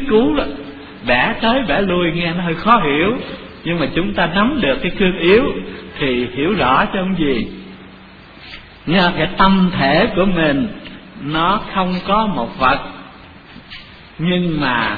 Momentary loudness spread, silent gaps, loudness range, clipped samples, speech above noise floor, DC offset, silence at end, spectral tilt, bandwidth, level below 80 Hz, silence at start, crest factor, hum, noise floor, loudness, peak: 18 LU; none; 4 LU; under 0.1%; 24 dB; under 0.1%; 0 s; -8.5 dB/octave; 5 kHz; -34 dBFS; 0 s; 16 dB; none; -39 dBFS; -16 LUFS; 0 dBFS